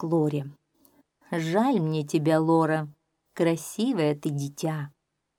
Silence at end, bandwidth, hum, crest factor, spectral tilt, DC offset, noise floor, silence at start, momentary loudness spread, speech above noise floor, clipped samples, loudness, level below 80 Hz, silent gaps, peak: 0.5 s; 16.5 kHz; none; 18 dB; -6.5 dB/octave; under 0.1%; -63 dBFS; 0 s; 12 LU; 38 dB; under 0.1%; -26 LUFS; -74 dBFS; none; -10 dBFS